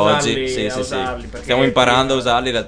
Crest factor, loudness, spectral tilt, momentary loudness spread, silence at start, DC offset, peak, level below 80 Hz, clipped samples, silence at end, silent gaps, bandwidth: 18 dB; -17 LUFS; -4 dB/octave; 9 LU; 0 s; 0.2%; 0 dBFS; -38 dBFS; under 0.1%; 0 s; none; 10 kHz